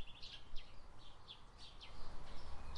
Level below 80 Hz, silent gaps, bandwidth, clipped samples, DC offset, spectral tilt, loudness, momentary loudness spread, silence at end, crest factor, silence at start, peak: -54 dBFS; none; 9.6 kHz; under 0.1%; under 0.1%; -4 dB/octave; -57 LUFS; 8 LU; 0 s; 14 dB; 0 s; -30 dBFS